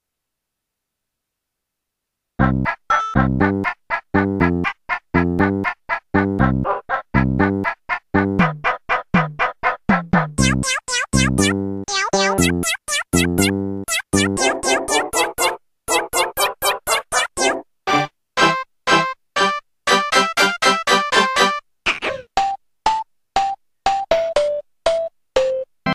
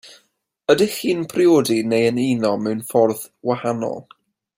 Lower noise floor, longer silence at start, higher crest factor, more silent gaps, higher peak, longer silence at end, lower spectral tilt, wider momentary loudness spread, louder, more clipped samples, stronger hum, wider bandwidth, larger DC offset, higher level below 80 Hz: first, -80 dBFS vs -65 dBFS; first, 2.4 s vs 0.05 s; about the same, 20 dB vs 18 dB; neither; about the same, 0 dBFS vs -2 dBFS; second, 0 s vs 0.55 s; second, -4 dB/octave vs -5.5 dB/octave; second, 7 LU vs 10 LU; about the same, -19 LUFS vs -19 LUFS; neither; neither; about the same, 15.5 kHz vs 16.5 kHz; neither; first, -38 dBFS vs -62 dBFS